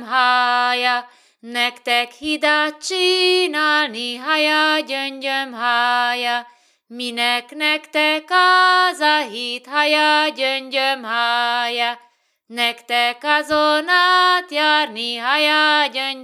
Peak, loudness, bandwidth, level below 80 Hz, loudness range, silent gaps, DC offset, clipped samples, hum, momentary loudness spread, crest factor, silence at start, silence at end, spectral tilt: -2 dBFS; -17 LUFS; 15.5 kHz; -68 dBFS; 3 LU; none; under 0.1%; under 0.1%; none; 8 LU; 16 dB; 0 s; 0 s; -0.5 dB/octave